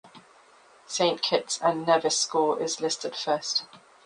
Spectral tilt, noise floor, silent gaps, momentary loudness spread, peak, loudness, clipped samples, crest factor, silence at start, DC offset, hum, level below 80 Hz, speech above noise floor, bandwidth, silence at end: -2 dB/octave; -56 dBFS; none; 6 LU; -8 dBFS; -26 LUFS; under 0.1%; 20 dB; 0.05 s; under 0.1%; none; -76 dBFS; 30 dB; 10.5 kHz; 0.3 s